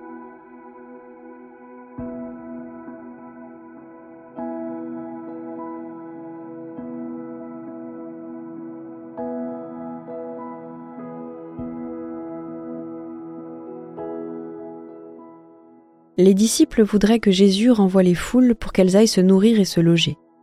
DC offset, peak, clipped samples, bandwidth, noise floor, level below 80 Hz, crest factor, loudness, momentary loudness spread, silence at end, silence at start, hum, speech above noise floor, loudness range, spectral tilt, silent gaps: under 0.1%; -2 dBFS; under 0.1%; 15 kHz; -51 dBFS; -48 dBFS; 20 dB; -19 LUFS; 25 LU; 0.3 s; 0 s; none; 36 dB; 20 LU; -5.5 dB/octave; none